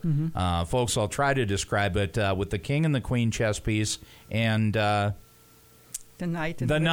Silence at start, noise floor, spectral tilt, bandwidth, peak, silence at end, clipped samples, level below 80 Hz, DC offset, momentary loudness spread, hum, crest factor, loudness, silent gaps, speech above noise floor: 0.05 s; -55 dBFS; -5 dB/octave; 20 kHz; -14 dBFS; 0 s; under 0.1%; -44 dBFS; under 0.1%; 9 LU; none; 14 dB; -27 LUFS; none; 30 dB